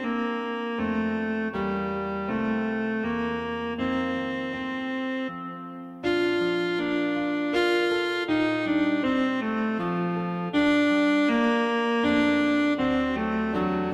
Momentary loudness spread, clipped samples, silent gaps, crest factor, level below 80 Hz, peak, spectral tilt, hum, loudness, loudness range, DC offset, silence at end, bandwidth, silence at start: 8 LU; under 0.1%; none; 14 dB; -54 dBFS; -12 dBFS; -6 dB/octave; none; -26 LUFS; 5 LU; under 0.1%; 0 s; 11.5 kHz; 0 s